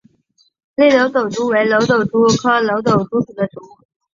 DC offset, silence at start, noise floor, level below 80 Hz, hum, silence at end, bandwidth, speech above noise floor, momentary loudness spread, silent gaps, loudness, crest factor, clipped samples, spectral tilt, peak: under 0.1%; 0.8 s; -59 dBFS; -54 dBFS; none; 0.5 s; 7.6 kHz; 44 dB; 10 LU; none; -15 LUFS; 16 dB; under 0.1%; -5 dB/octave; 0 dBFS